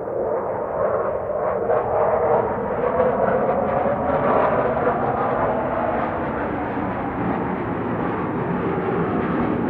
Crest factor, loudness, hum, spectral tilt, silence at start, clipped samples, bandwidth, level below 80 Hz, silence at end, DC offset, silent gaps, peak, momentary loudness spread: 14 dB; -22 LUFS; none; -10.5 dB/octave; 0 s; under 0.1%; 4.7 kHz; -44 dBFS; 0 s; under 0.1%; none; -6 dBFS; 6 LU